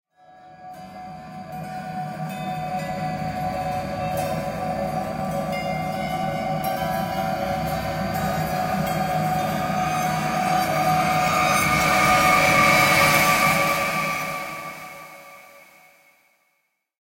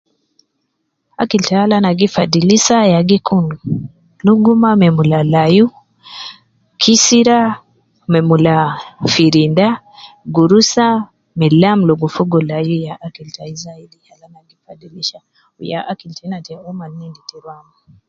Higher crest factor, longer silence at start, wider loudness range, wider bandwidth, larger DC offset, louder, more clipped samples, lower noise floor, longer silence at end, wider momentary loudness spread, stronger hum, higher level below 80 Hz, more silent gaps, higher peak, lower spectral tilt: about the same, 18 dB vs 14 dB; second, 0.4 s vs 1.2 s; about the same, 12 LU vs 14 LU; first, 16 kHz vs 7.8 kHz; neither; second, -22 LUFS vs -12 LUFS; neither; about the same, -72 dBFS vs -69 dBFS; first, 1.4 s vs 0.55 s; about the same, 19 LU vs 19 LU; neither; first, -46 dBFS vs -52 dBFS; neither; second, -6 dBFS vs 0 dBFS; about the same, -4 dB/octave vs -5 dB/octave